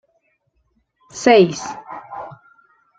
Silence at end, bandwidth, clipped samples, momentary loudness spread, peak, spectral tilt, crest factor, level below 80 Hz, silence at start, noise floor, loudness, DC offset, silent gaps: 0.7 s; 9.2 kHz; under 0.1%; 23 LU; -2 dBFS; -5 dB/octave; 20 dB; -62 dBFS; 1.15 s; -66 dBFS; -15 LUFS; under 0.1%; none